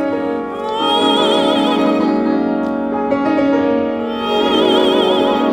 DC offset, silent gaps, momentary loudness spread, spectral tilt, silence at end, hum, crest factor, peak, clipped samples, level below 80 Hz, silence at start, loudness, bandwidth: under 0.1%; none; 7 LU; -5 dB/octave; 0 s; none; 14 dB; 0 dBFS; under 0.1%; -50 dBFS; 0 s; -15 LUFS; 15.5 kHz